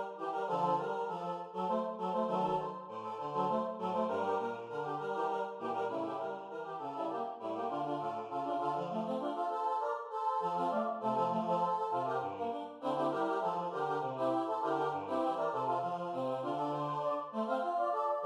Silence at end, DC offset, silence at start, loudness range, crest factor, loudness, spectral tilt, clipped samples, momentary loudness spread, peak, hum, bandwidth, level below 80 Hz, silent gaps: 0 s; under 0.1%; 0 s; 3 LU; 14 dB; -36 LUFS; -7 dB/octave; under 0.1%; 6 LU; -20 dBFS; none; 11 kHz; -82 dBFS; none